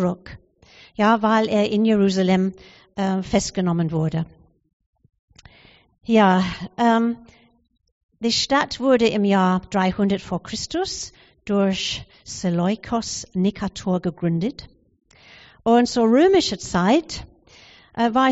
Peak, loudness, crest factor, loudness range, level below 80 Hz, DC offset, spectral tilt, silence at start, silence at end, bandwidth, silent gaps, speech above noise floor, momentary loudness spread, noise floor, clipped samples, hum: -4 dBFS; -21 LUFS; 18 dB; 5 LU; -50 dBFS; under 0.1%; -5 dB/octave; 0 s; 0 s; 8 kHz; 4.73-4.80 s, 4.86-4.93 s, 5.19-5.28 s, 7.92-8.09 s; 33 dB; 14 LU; -52 dBFS; under 0.1%; none